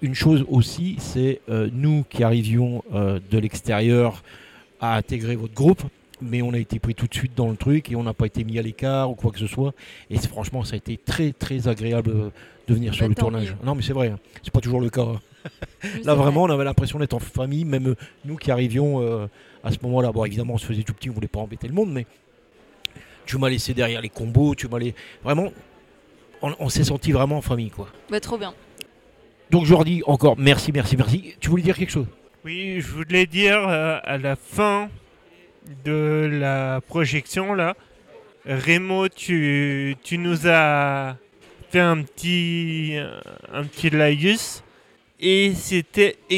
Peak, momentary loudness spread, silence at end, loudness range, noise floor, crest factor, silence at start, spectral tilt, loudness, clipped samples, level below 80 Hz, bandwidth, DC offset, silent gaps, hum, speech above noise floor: -2 dBFS; 14 LU; 0 s; 5 LU; -55 dBFS; 20 dB; 0 s; -6 dB/octave; -22 LUFS; under 0.1%; -42 dBFS; 16 kHz; under 0.1%; none; none; 34 dB